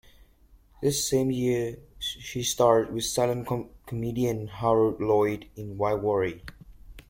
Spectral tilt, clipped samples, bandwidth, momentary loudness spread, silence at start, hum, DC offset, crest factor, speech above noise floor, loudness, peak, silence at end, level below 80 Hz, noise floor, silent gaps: -5 dB/octave; under 0.1%; 16.5 kHz; 11 LU; 0.8 s; none; under 0.1%; 20 dB; 31 dB; -27 LUFS; -6 dBFS; 0.1 s; -52 dBFS; -57 dBFS; none